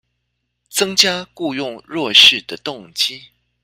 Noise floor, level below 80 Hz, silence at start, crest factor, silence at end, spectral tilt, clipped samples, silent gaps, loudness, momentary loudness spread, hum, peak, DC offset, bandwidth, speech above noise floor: -73 dBFS; -60 dBFS; 0.75 s; 18 dB; 0.45 s; -1 dB/octave; under 0.1%; none; -14 LUFS; 18 LU; 60 Hz at -50 dBFS; 0 dBFS; under 0.1%; 16.5 kHz; 56 dB